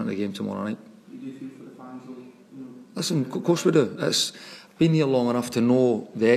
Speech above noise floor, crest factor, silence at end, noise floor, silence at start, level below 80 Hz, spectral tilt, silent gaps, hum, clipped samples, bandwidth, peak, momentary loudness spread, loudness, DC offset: 20 dB; 18 dB; 0 s; -43 dBFS; 0 s; -68 dBFS; -5.5 dB/octave; none; none; under 0.1%; 15 kHz; -6 dBFS; 22 LU; -24 LUFS; under 0.1%